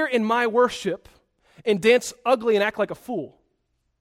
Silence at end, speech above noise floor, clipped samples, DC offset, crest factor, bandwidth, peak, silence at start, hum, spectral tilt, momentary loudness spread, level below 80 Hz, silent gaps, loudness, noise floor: 0.75 s; 50 dB; under 0.1%; under 0.1%; 18 dB; 15 kHz; -4 dBFS; 0 s; none; -4 dB/octave; 13 LU; -62 dBFS; none; -22 LUFS; -72 dBFS